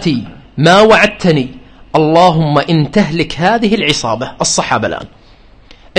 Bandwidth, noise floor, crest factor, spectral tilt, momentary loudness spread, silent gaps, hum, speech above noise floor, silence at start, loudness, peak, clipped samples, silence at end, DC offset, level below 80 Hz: 9.8 kHz; -41 dBFS; 12 dB; -4.5 dB/octave; 11 LU; none; none; 30 dB; 0 s; -11 LUFS; 0 dBFS; 0.2%; 0 s; under 0.1%; -38 dBFS